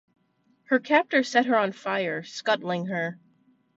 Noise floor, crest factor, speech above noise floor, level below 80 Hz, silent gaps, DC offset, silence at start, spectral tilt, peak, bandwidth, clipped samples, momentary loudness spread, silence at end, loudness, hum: -68 dBFS; 20 dB; 43 dB; -76 dBFS; none; under 0.1%; 0.7 s; -5 dB/octave; -6 dBFS; 8 kHz; under 0.1%; 9 LU; 0.65 s; -25 LUFS; none